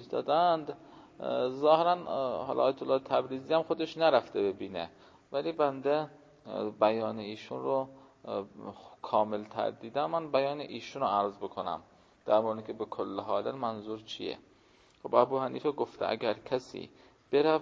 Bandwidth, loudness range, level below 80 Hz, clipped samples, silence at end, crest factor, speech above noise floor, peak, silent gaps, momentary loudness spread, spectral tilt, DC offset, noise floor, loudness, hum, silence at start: 7.6 kHz; 5 LU; -72 dBFS; under 0.1%; 0 s; 22 dB; 32 dB; -10 dBFS; none; 15 LU; -6.5 dB/octave; under 0.1%; -63 dBFS; -32 LUFS; none; 0 s